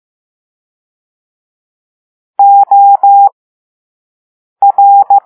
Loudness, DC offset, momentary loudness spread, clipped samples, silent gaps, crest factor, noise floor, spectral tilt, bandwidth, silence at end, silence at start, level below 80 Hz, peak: -6 LUFS; under 0.1%; 6 LU; under 0.1%; 3.32-4.56 s; 10 dB; under -90 dBFS; -6 dB/octave; 1.5 kHz; 0.05 s; 2.4 s; -76 dBFS; 0 dBFS